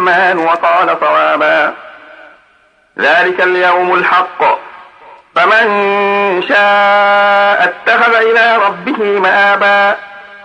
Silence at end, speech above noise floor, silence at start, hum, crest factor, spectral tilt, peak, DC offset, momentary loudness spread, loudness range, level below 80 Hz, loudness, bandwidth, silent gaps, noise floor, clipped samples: 0.05 s; 40 dB; 0 s; none; 10 dB; -4.5 dB/octave; 0 dBFS; under 0.1%; 6 LU; 3 LU; -64 dBFS; -10 LUFS; 10 kHz; none; -50 dBFS; under 0.1%